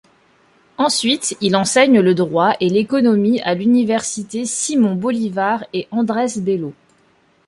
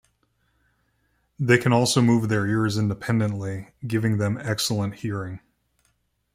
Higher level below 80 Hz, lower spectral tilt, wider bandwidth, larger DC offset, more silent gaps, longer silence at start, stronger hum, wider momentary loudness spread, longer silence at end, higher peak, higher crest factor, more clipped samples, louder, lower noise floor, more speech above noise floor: about the same, -60 dBFS vs -58 dBFS; about the same, -4.5 dB/octave vs -5.5 dB/octave; second, 11.5 kHz vs 16 kHz; neither; neither; second, 0.8 s vs 1.4 s; neither; second, 9 LU vs 13 LU; second, 0.75 s vs 0.95 s; about the same, -2 dBFS vs -4 dBFS; second, 16 dB vs 22 dB; neither; first, -17 LUFS vs -23 LUFS; second, -56 dBFS vs -69 dBFS; second, 40 dB vs 47 dB